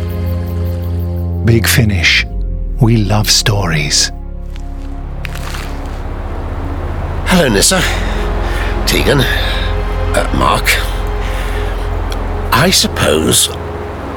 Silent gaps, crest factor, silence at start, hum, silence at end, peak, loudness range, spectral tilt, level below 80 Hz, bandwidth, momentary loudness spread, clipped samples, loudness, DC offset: none; 14 dB; 0 s; none; 0 s; 0 dBFS; 6 LU; -3.5 dB/octave; -20 dBFS; 19.5 kHz; 14 LU; under 0.1%; -13 LUFS; under 0.1%